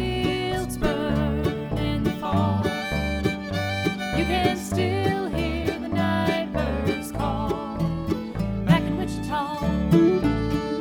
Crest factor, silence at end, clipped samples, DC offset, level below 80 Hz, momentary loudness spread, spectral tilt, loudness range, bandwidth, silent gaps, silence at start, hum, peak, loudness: 18 dB; 0 s; under 0.1%; under 0.1%; -36 dBFS; 6 LU; -6.5 dB/octave; 2 LU; 19 kHz; none; 0 s; none; -6 dBFS; -25 LUFS